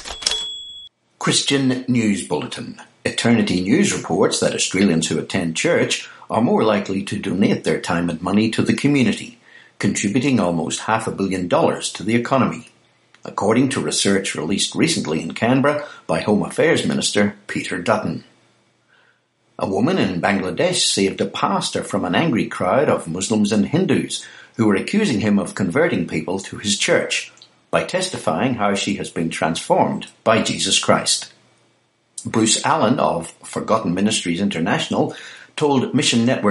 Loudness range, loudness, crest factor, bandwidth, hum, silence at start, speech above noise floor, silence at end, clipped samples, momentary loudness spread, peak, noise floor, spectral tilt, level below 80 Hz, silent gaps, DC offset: 2 LU; -19 LUFS; 18 dB; 11.5 kHz; none; 0 s; 43 dB; 0 s; under 0.1%; 8 LU; 0 dBFS; -62 dBFS; -4 dB/octave; -56 dBFS; none; under 0.1%